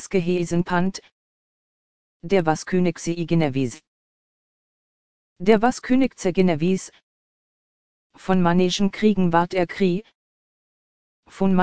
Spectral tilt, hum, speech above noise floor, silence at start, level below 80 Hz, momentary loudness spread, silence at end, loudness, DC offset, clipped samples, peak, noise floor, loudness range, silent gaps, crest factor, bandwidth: -6.5 dB/octave; none; over 70 dB; 0 s; -50 dBFS; 9 LU; 0 s; -21 LUFS; 2%; under 0.1%; -2 dBFS; under -90 dBFS; 3 LU; 1.12-2.20 s, 3.87-5.36 s, 7.03-8.10 s, 10.15-11.23 s; 20 dB; 9.4 kHz